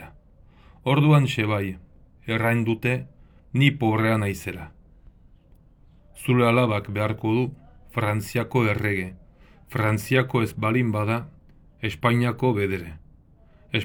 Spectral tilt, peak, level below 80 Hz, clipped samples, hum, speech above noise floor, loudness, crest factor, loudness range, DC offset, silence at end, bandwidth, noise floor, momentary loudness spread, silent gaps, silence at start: -7 dB/octave; -4 dBFS; -52 dBFS; under 0.1%; none; 31 dB; -24 LUFS; 20 dB; 2 LU; under 0.1%; 0 s; over 20 kHz; -53 dBFS; 13 LU; none; 0 s